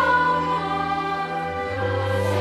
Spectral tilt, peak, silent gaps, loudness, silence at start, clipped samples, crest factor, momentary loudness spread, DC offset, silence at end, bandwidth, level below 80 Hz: -6 dB/octave; -8 dBFS; none; -23 LUFS; 0 s; under 0.1%; 14 dB; 7 LU; under 0.1%; 0 s; 13.5 kHz; -50 dBFS